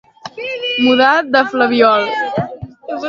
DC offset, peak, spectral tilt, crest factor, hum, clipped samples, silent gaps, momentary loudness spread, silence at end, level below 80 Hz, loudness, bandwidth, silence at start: under 0.1%; 0 dBFS; -5.5 dB/octave; 14 dB; none; under 0.1%; none; 16 LU; 0 s; -52 dBFS; -13 LUFS; 7.2 kHz; 0.25 s